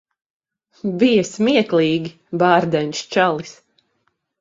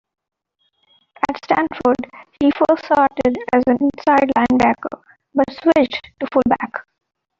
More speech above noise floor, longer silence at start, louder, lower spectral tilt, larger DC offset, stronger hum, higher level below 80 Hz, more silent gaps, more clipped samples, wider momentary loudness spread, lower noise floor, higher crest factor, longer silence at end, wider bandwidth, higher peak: about the same, 52 dB vs 51 dB; second, 0.85 s vs 1.3 s; about the same, -18 LUFS vs -17 LUFS; about the same, -5.5 dB/octave vs -6.5 dB/octave; neither; neither; second, -60 dBFS vs -50 dBFS; neither; neither; about the same, 12 LU vs 10 LU; about the same, -69 dBFS vs -68 dBFS; about the same, 18 dB vs 18 dB; first, 0.9 s vs 0.6 s; about the same, 7.8 kHz vs 7.6 kHz; about the same, 0 dBFS vs 0 dBFS